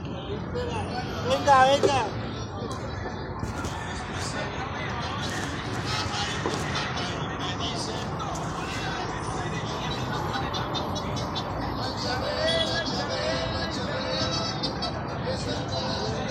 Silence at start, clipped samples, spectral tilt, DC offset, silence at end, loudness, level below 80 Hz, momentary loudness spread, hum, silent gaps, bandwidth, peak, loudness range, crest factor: 0 s; under 0.1%; -4.5 dB/octave; under 0.1%; 0 s; -28 LUFS; -44 dBFS; 8 LU; none; none; 15.5 kHz; -8 dBFS; 5 LU; 22 dB